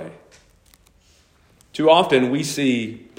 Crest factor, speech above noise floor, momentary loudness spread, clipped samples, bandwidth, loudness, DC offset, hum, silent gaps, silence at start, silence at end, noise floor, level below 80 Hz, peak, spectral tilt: 20 dB; 38 dB; 16 LU; under 0.1%; 16 kHz; -18 LUFS; under 0.1%; none; none; 0 s; 0.2 s; -56 dBFS; -60 dBFS; -2 dBFS; -4.5 dB/octave